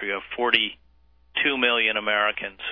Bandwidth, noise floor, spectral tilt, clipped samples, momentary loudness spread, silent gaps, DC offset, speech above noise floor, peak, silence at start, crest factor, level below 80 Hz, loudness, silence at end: 5.4 kHz; -60 dBFS; -5 dB/octave; under 0.1%; 9 LU; none; under 0.1%; 36 dB; -4 dBFS; 0 s; 22 dB; -60 dBFS; -22 LUFS; 0 s